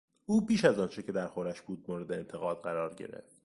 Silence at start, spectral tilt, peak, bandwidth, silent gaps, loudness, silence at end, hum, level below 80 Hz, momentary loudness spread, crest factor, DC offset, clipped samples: 0.3 s; -6 dB/octave; -10 dBFS; 11.5 kHz; none; -33 LUFS; 0.25 s; none; -68 dBFS; 13 LU; 24 dB; under 0.1%; under 0.1%